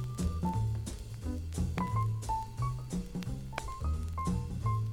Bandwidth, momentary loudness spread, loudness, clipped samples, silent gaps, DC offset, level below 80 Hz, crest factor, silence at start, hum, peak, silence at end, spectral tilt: 16 kHz; 7 LU; -36 LUFS; under 0.1%; none; under 0.1%; -42 dBFS; 18 dB; 0 s; none; -16 dBFS; 0 s; -6.5 dB/octave